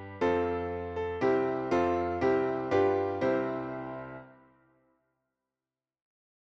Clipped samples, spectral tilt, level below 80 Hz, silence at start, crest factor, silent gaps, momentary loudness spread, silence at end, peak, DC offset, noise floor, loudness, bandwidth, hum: under 0.1%; -7.5 dB/octave; -58 dBFS; 0 s; 16 dB; none; 11 LU; 2.2 s; -16 dBFS; under 0.1%; under -90 dBFS; -30 LUFS; 7.2 kHz; none